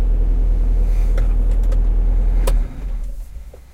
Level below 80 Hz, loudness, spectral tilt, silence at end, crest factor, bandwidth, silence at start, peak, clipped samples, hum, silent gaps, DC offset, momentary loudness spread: -16 dBFS; -21 LUFS; -7 dB/octave; 0.15 s; 10 dB; 3.8 kHz; 0 s; -6 dBFS; under 0.1%; none; none; under 0.1%; 12 LU